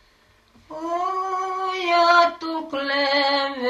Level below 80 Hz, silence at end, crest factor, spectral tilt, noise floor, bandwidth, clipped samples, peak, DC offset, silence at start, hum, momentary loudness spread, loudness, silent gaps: -64 dBFS; 0 s; 16 dB; -2 dB/octave; -58 dBFS; 12.5 kHz; under 0.1%; -6 dBFS; under 0.1%; 0.7 s; none; 13 LU; -21 LUFS; none